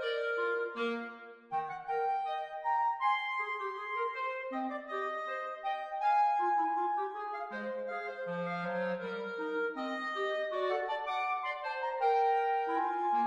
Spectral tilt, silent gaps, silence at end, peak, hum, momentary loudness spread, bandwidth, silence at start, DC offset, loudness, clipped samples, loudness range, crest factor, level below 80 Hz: -5.5 dB/octave; none; 0 s; -20 dBFS; none; 9 LU; 9.4 kHz; 0 s; under 0.1%; -34 LUFS; under 0.1%; 3 LU; 14 dB; -82 dBFS